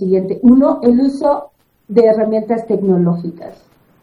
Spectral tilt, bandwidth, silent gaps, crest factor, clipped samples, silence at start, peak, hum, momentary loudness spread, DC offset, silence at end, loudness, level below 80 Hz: -10 dB/octave; 10.5 kHz; none; 14 dB; under 0.1%; 0 s; 0 dBFS; none; 10 LU; under 0.1%; 0.5 s; -13 LUFS; -48 dBFS